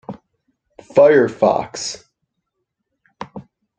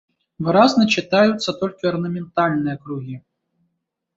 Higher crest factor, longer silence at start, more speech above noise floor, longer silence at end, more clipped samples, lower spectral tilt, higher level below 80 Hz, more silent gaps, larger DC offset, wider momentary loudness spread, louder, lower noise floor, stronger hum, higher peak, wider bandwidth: about the same, 18 dB vs 18 dB; second, 0.1 s vs 0.4 s; first, 62 dB vs 57 dB; second, 0.35 s vs 0.95 s; neither; about the same, -4.5 dB/octave vs -5.5 dB/octave; about the same, -60 dBFS vs -60 dBFS; neither; neither; first, 24 LU vs 16 LU; first, -16 LUFS vs -19 LUFS; about the same, -76 dBFS vs -75 dBFS; neither; about the same, 0 dBFS vs -2 dBFS; first, 9 kHz vs 7.8 kHz